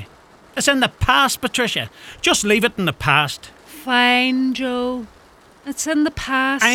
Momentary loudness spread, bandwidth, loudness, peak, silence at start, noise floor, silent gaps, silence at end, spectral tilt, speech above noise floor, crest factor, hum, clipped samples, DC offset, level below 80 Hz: 15 LU; 18 kHz; -18 LUFS; 0 dBFS; 0 s; -48 dBFS; none; 0 s; -3 dB/octave; 30 dB; 20 dB; none; under 0.1%; under 0.1%; -42 dBFS